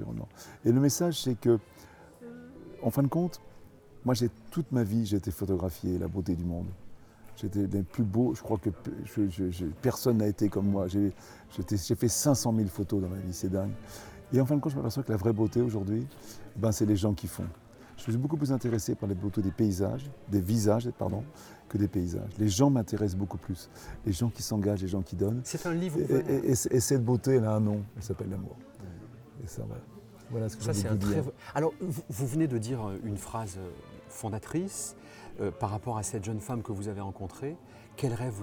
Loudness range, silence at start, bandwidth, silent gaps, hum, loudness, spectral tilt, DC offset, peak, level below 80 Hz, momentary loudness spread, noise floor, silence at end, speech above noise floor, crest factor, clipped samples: 6 LU; 0 s; over 20 kHz; none; none; -31 LUFS; -6.5 dB/octave; under 0.1%; -12 dBFS; -56 dBFS; 16 LU; -52 dBFS; 0 s; 23 dB; 18 dB; under 0.1%